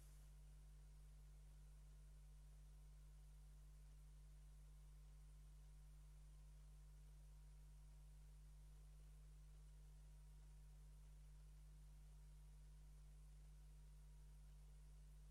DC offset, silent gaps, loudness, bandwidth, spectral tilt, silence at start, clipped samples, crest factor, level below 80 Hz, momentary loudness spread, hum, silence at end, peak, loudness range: under 0.1%; none; -67 LUFS; 12.5 kHz; -5.5 dB/octave; 0 s; under 0.1%; 6 dB; -64 dBFS; 0 LU; 50 Hz at -65 dBFS; 0 s; -56 dBFS; 0 LU